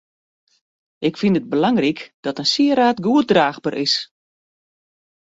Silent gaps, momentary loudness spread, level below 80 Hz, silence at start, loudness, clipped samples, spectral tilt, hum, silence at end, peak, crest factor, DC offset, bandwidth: 2.14-2.23 s; 9 LU; -62 dBFS; 1 s; -18 LUFS; under 0.1%; -5 dB/octave; none; 1.35 s; -2 dBFS; 18 dB; under 0.1%; 8 kHz